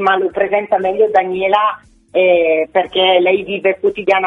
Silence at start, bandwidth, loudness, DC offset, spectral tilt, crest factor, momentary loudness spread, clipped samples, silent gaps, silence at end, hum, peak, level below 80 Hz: 0 s; 6 kHz; -14 LUFS; under 0.1%; -6 dB/octave; 14 dB; 5 LU; under 0.1%; none; 0 s; none; 0 dBFS; -54 dBFS